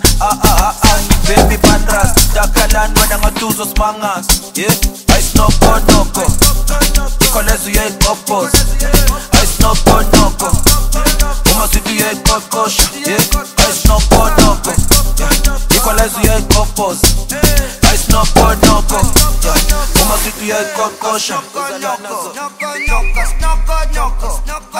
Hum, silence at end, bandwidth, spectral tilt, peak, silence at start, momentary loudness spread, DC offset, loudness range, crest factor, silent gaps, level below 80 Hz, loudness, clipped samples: none; 0 s; 16.5 kHz; -3.5 dB/octave; 0 dBFS; 0 s; 7 LU; under 0.1%; 4 LU; 10 dB; none; -14 dBFS; -11 LUFS; 0.8%